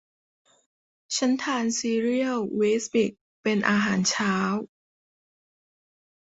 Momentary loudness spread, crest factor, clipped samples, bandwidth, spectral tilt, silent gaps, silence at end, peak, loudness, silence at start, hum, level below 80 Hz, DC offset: 7 LU; 22 dB; under 0.1%; 8.2 kHz; -4 dB/octave; 3.21-3.44 s; 1.75 s; -6 dBFS; -25 LUFS; 1.1 s; none; -68 dBFS; under 0.1%